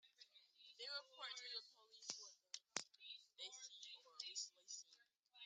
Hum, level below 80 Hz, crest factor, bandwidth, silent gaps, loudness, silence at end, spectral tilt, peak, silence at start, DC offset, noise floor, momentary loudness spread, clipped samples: none; under -90 dBFS; 34 dB; 10 kHz; none; -53 LUFS; 0 s; 1.5 dB/octave; -22 dBFS; 0.05 s; under 0.1%; -76 dBFS; 16 LU; under 0.1%